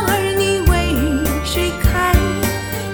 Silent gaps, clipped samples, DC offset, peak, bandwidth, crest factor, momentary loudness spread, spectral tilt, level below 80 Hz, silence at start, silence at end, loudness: none; under 0.1%; 0.3%; 0 dBFS; 19.5 kHz; 16 dB; 4 LU; -5 dB/octave; -22 dBFS; 0 s; 0 s; -17 LUFS